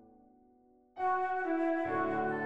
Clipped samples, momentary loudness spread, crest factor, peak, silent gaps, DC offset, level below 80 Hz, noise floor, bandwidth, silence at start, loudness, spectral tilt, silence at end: under 0.1%; 4 LU; 14 dB; -22 dBFS; none; under 0.1%; -72 dBFS; -65 dBFS; 6.6 kHz; 0 s; -33 LUFS; -8 dB/octave; 0 s